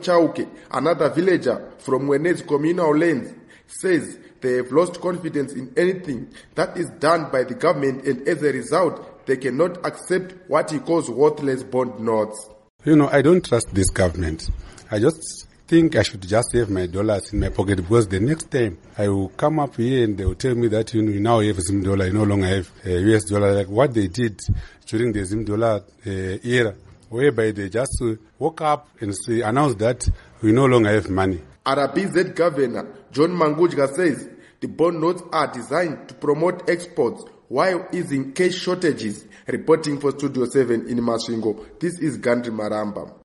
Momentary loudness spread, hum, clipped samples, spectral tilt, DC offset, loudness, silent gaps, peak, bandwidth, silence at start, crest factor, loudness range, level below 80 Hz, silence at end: 9 LU; none; under 0.1%; -6 dB/octave; under 0.1%; -21 LUFS; 12.70-12.79 s; -2 dBFS; 11.5 kHz; 0 s; 18 dB; 3 LU; -40 dBFS; 0.1 s